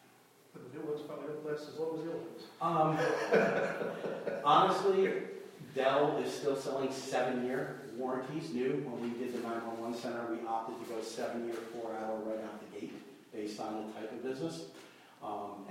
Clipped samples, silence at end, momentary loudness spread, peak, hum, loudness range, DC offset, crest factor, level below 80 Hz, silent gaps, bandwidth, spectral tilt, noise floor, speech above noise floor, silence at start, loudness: under 0.1%; 0 s; 16 LU; -14 dBFS; none; 10 LU; under 0.1%; 22 dB; -80 dBFS; none; 16 kHz; -5.5 dB/octave; -62 dBFS; 28 dB; 0.55 s; -35 LUFS